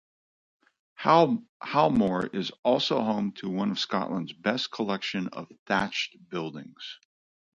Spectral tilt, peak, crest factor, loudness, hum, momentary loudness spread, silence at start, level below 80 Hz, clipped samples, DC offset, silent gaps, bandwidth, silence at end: -5.5 dB/octave; -6 dBFS; 22 dB; -27 LUFS; none; 15 LU; 1 s; -64 dBFS; under 0.1%; under 0.1%; 1.49-1.60 s, 2.59-2.63 s, 5.59-5.66 s; 7.6 kHz; 0.6 s